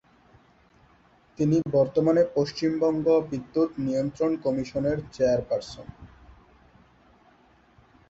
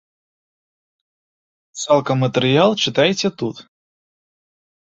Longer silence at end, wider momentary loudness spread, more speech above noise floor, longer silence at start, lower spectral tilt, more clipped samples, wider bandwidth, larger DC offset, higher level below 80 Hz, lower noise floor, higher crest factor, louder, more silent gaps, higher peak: first, 2.05 s vs 1.25 s; second, 8 LU vs 12 LU; second, 35 dB vs over 73 dB; second, 1.4 s vs 1.75 s; first, -7.5 dB/octave vs -5 dB/octave; neither; about the same, 7.8 kHz vs 8 kHz; neither; about the same, -56 dBFS vs -60 dBFS; second, -59 dBFS vs under -90 dBFS; about the same, 16 dB vs 20 dB; second, -25 LUFS vs -17 LUFS; neither; second, -10 dBFS vs -2 dBFS